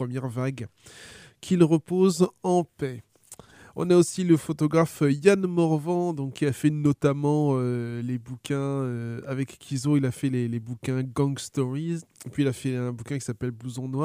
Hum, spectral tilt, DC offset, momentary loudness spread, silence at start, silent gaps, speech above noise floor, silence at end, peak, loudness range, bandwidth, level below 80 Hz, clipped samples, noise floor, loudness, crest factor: none; -7 dB/octave; under 0.1%; 13 LU; 0 s; none; 25 dB; 0 s; -4 dBFS; 5 LU; 15.5 kHz; -62 dBFS; under 0.1%; -50 dBFS; -26 LUFS; 22 dB